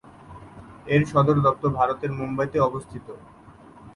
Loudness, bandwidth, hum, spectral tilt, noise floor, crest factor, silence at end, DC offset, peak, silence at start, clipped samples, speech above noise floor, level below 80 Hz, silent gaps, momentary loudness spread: -22 LUFS; 11 kHz; none; -8 dB/octave; -47 dBFS; 18 dB; 0.05 s; under 0.1%; -6 dBFS; 0.25 s; under 0.1%; 24 dB; -50 dBFS; none; 24 LU